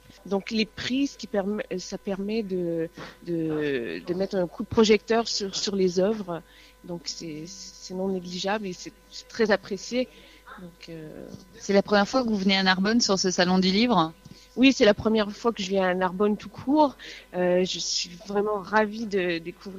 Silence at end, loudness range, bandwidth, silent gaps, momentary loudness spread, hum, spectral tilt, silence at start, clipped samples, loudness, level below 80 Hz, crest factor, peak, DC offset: 0 s; 8 LU; 14.5 kHz; none; 18 LU; none; -4.5 dB/octave; 0.25 s; under 0.1%; -25 LUFS; -56 dBFS; 22 dB; -4 dBFS; under 0.1%